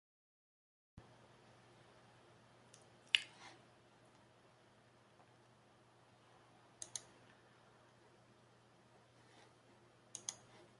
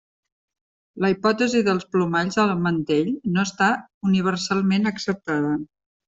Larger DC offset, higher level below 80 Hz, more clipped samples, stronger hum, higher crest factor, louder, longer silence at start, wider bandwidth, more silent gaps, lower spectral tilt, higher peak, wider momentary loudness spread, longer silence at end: neither; second, -84 dBFS vs -60 dBFS; neither; neither; first, 42 dB vs 18 dB; second, -42 LUFS vs -22 LUFS; about the same, 0.95 s vs 0.95 s; first, 11.5 kHz vs 7.8 kHz; second, none vs 3.94-4.01 s; second, 0 dB/octave vs -5.5 dB/octave; second, -12 dBFS vs -6 dBFS; first, 20 LU vs 5 LU; second, 0 s vs 0.45 s